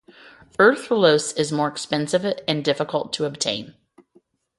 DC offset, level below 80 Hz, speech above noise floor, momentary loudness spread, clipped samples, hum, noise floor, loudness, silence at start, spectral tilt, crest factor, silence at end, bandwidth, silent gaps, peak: under 0.1%; -66 dBFS; 39 dB; 8 LU; under 0.1%; none; -60 dBFS; -21 LUFS; 0.6 s; -4 dB/octave; 20 dB; 0.9 s; 11.5 kHz; none; -2 dBFS